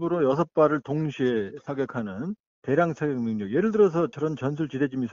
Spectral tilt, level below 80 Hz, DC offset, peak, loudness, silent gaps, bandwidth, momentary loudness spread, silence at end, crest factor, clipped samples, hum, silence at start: -7 dB/octave; -62 dBFS; under 0.1%; -8 dBFS; -26 LUFS; 2.40-2.62 s; 7.4 kHz; 10 LU; 0 s; 18 dB; under 0.1%; none; 0 s